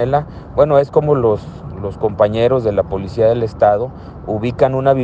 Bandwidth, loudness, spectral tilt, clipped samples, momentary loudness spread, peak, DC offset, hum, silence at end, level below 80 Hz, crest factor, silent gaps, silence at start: 7.8 kHz; -16 LUFS; -9 dB/octave; under 0.1%; 12 LU; 0 dBFS; under 0.1%; none; 0 s; -38 dBFS; 16 dB; none; 0 s